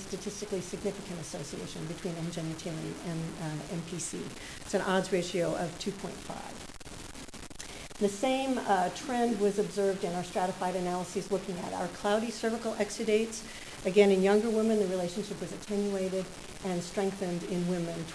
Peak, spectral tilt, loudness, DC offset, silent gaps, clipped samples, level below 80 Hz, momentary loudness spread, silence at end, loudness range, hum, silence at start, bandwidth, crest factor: -12 dBFS; -5 dB/octave; -32 LUFS; under 0.1%; none; under 0.1%; -56 dBFS; 13 LU; 0 s; 8 LU; none; 0 s; 11 kHz; 20 dB